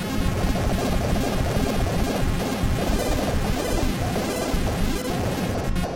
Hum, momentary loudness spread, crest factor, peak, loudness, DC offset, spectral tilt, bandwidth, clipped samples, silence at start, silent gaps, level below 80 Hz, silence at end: none; 2 LU; 14 dB; -10 dBFS; -25 LUFS; under 0.1%; -5.5 dB/octave; 17 kHz; under 0.1%; 0 s; none; -28 dBFS; 0 s